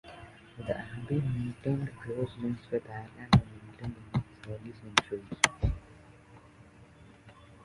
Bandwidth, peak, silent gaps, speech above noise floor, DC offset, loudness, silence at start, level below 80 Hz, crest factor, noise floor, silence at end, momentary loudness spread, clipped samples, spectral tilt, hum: 11.5 kHz; -2 dBFS; none; 24 dB; under 0.1%; -32 LUFS; 0.05 s; -46 dBFS; 32 dB; -55 dBFS; 0.1 s; 17 LU; under 0.1%; -5 dB/octave; none